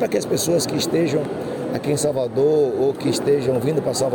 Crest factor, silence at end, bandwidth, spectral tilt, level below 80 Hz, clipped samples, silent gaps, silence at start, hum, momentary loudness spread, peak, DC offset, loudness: 12 dB; 0 s; 17.5 kHz; -5 dB/octave; -58 dBFS; under 0.1%; none; 0 s; none; 6 LU; -8 dBFS; under 0.1%; -20 LUFS